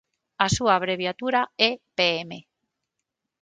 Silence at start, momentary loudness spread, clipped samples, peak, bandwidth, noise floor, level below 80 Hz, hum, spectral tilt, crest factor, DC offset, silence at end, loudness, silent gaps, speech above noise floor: 0.4 s; 9 LU; under 0.1%; -2 dBFS; 9.6 kHz; -83 dBFS; -54 dBFS; none; -3.5 dB/octave; 24 dB; under 0.1%; 1 s; -23 LUFS; none; 59 dB